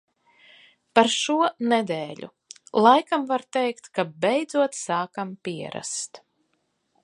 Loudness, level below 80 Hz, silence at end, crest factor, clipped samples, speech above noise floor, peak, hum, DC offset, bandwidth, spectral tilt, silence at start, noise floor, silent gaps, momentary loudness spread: -24 LUFS; -76 dBFS; 0.85 s; 24 dB; under 0.1%; 49 dB; 0 dBFS; none; under 0.1%; 11.5 kHz; -3.5 dB/octave; 0.95 s; -73 dBFS; none; 13 LU